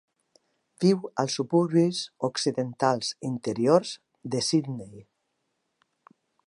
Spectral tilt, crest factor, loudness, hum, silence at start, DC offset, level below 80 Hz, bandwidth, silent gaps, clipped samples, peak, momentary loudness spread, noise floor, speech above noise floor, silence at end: -5.5 dB/octave; 22 dB; -26 LUFS; none; 0.8 s; under 0.1%; -72 dBFS; 11.5 kHz; none; under 0.1%; -6 dBFS; 13 LU; -77 dBFS; 52 dB; 1.45 s